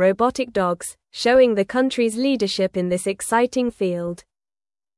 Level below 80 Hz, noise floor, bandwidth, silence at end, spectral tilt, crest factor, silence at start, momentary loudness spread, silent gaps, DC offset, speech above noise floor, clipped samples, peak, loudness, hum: -56 dBFS; under -90 dBFS; 12 kHz; 0.8 s; -4.5 dB/octave; 16 dB; 0 s; 11 LU; none; under 0.1%; over 70 dB; under 0.1%; -6 dBFS; -20 LUFS; none